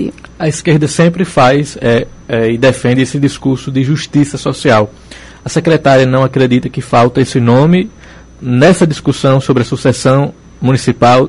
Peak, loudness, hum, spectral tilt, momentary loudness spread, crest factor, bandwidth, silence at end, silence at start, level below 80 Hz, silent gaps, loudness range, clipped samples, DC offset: 0 dBFS; -11 LUFS; none; -6.5 dB/octave; 8 LU; 10 dB; 11.5 kHz; 0 s; 0 s; -38 dBFS; none; 2 LU; under 0.1%; under 0.1%